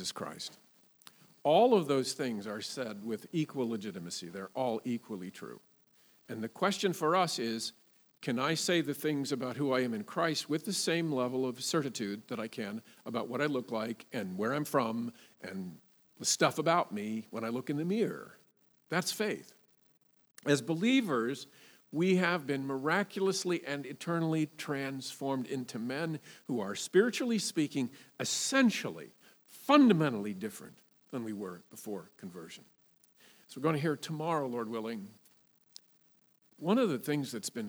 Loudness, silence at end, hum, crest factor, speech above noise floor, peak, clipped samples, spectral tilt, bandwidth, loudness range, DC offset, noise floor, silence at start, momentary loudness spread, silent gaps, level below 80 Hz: -33 LUFS; 0 s; none; 24 dB; 36 dB; -10 dBFS; under 0.1%; -4.5 dB/octave; over 20 kHz; 7 LU; under 0.1%; -69 dBFS; 0 s; 15 LU; none; -90 dBFS